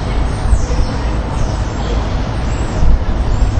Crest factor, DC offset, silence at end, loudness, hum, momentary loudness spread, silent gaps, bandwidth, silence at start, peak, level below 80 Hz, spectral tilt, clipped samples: 14 dB; under 0.1%; 0 s; -18 LUFS; none; 3 LU; none; 9.2 kHz; 0 s; 0 dBFS; -16 dBFS; -6.5 dB/octave; 0.2%